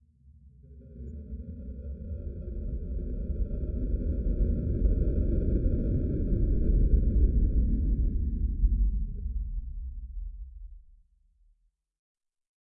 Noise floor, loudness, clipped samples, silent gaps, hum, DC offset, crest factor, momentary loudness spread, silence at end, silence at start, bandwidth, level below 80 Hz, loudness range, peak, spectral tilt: -69 dBFS; -31 LUFS; under 0.1%; none; none; under 0.1%; 16 dB; 16 LU; 1.95 s; 0.45 s; 1.6 kHz; -30 dBFS; 12 LU; -12 dBFS; -14 dB/octave